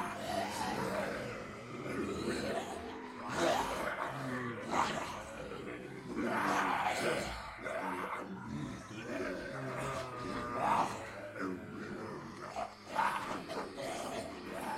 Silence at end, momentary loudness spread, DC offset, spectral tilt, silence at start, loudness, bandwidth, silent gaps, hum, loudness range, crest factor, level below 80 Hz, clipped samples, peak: 0 s; 11 LU; under 0.1%; -4.5 dB/octave; 0 s; -38 LUFS; 16.5 kHz; none; none; 4 LU; 20 dB; -62 dBFS; under 0.1%; -18 dBFS